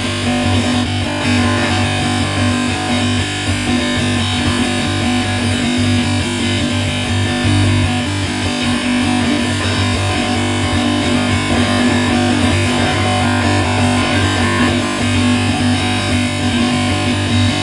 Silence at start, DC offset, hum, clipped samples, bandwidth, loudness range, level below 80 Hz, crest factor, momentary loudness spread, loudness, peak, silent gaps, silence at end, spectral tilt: 0 s; under 0.1%; none; under 0.1%; 11.5 kHz; 2 LU; -36 dBFS; 14 dB; 3 LU; -15 LUFS; 0 dBFS; none; 0 s; -4.5 dB/octave